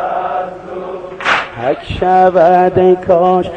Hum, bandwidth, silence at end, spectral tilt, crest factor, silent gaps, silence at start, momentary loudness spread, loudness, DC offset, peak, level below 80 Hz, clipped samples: none; 8.8 kHz; 0 s; -6.5 dB/octave; 12 dB; none; 0 s; 16 LU; -12 LUFS; under 0.1%; 0 dBFS; -38 dBFS; under 0.1%